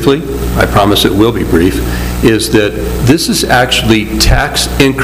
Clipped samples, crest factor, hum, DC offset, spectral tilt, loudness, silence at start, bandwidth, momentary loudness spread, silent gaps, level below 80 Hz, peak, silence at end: 0.9%; 10 dB; none; under 0.1%; -4.5 dB/octave; -10 LUFS; 0 s; 16.5 kHz; 6 LU; none; -20 dBFS; 0 dBFS; 0 s